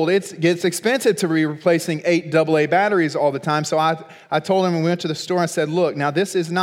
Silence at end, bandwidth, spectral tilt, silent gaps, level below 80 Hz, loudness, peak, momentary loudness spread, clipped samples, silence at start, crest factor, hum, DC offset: 0 s; 16.5 kHz; -5 dB/octave; none; -76 dBFS; -19 LUFS; -4 dBFS; 4 LU; under 0.1%; 0 s; 16 dB; none; under 0.1%